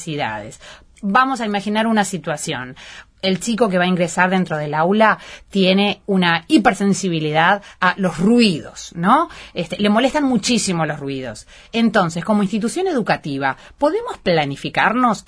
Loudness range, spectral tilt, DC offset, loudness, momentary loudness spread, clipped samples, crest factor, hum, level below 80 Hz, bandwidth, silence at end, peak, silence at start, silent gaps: 4 LU; -5 dB/octave; under 0.1%; -18 LUFS; 11 LU; under 0.1%; 18 dB; none; -50 dBFS; 11 kHz; 0.05 s; 0 dBFS; 0 s; none